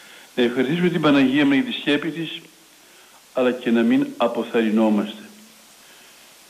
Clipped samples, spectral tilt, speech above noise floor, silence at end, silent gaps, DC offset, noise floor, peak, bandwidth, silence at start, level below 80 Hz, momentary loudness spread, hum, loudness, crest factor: under 0.1%; -6 dB/octave; 30 dB; 1.2 s; none; under 0.1%; -50 dBFS; -8 dBFS; 15 kHz; 0.1 s; -66 dBFS; 14 LU; none; -20 LUFS; 14 dB